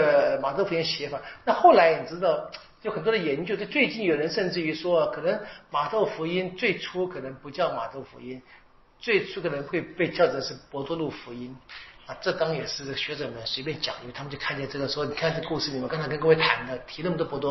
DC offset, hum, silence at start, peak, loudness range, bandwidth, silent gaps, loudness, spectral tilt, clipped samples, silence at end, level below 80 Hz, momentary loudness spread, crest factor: under 0.1%; none; 0 s; -6 dBFS; 7 LU; 6.2 kHz; none; -26 LUFS; -3 dB/octave; under 0.1%; 0 s; -58 dBFS; 15 LU; 22 dB